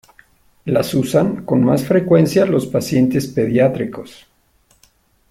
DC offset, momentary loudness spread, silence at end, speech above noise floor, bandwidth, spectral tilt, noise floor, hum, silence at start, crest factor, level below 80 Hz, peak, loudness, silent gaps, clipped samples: under 0.1%; 9 LU; 1.2 s; 42 dB; 16 kHz; -7 dB/octave; -57 dBFS; none; 0.65 s; 16 dB; -50 dBFS; -2 dBFS; -16 LUFS; none; under 0.1%